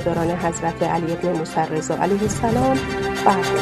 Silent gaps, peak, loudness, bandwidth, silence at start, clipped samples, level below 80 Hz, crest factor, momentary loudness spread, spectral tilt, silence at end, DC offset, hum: none; 0 dBFS; -21 LUFS; 13.5 kHz; 0 s; under 0.1%; -42 dBFS; 20 dB; 4 LU; -5.5 dB/octave; 0 s; under 0.1%; none